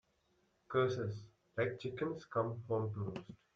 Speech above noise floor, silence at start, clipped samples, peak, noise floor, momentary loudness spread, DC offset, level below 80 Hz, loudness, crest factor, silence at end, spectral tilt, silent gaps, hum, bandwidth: 39 dB; 0.7 s; under 0.1%; -22 dBFS; -77 dBFS; 10 LU; under 0.1%; -72 dBFS; -39 LUFS; 18 dB; 0.2 s; -7.5 dB/octave; none; none; 7.4 kHz